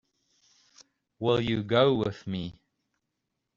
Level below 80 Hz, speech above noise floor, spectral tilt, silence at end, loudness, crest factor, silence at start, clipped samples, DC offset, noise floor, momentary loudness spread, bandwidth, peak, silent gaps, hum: -60 dBFS; 56 dB; -5 dB/octave; 1.05 s; -27 LUFS; 22 dB; 1.2 s; under 0.1%; under 0.1%; -83 dBFS; 13 LU; 7.4 kHz; -8 dBFS; none; none